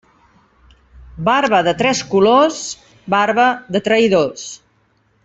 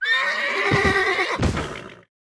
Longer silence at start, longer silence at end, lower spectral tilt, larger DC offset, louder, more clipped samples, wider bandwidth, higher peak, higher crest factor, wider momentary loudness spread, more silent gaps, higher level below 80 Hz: first, 1.15 s vs 0 s; first, 0.7 s vs 0.4 s; about the same, -4 dB/octave vs -4.5 dB/octave; neither; first, -15 LUFS vs -20 LUFS; neither; second, 8.2 kHz vs 11 kHz; about the same, -2 dBFS vs -4 dBFS; about the same, 14 dB vs 18 dB; about the same, 14 LU vs 12 LU; neither; second, -50 dBFS vs -38 dBFS